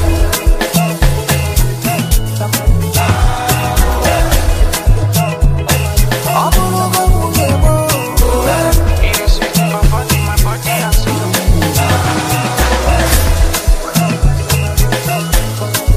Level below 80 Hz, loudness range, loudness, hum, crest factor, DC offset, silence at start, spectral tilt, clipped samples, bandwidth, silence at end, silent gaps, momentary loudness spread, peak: -14 dBFS; 1 LU; -13 LUFS; none; 12 dB; under 0.1%; 0 s; -4.5 dB/octave; under 0.1%; 15.5 kHz; 0 s; none; 3 LU; 0 dBFS